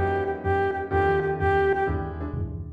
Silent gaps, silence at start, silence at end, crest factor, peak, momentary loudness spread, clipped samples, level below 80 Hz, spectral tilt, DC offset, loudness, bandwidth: none; 0 s; 0 s; 12 dB; -12 dBFS; 9 LU; under 0.1%; -38 dBFS; -8.5 dB/octave; under 0.1%; -25 LUFS; 5 kHz